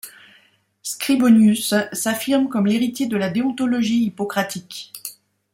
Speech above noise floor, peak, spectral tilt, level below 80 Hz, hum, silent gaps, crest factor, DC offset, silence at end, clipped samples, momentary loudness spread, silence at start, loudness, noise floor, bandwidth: 38 dB; -4 dBFS; -4.5 dB/octave; -64 dBFS; none; none; 16 dB; under 0.1%; 0.4 s; under 0.1%; 19 LU; 0.05 s; -19 LUFS; -57 dBFS; 16.5 kHz